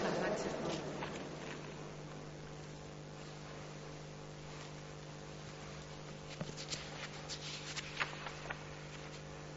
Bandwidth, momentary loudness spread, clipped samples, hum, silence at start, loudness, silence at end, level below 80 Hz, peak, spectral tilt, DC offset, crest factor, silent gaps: 8 kHz; 10 LU; under 0.1%; 50 Hz at -55 dBFS; 0 s; -45 LUFS; 0 s; -64 dBFS; -20 dBFS; -3.5 dB/octave; under 0.1%; 24 dB; none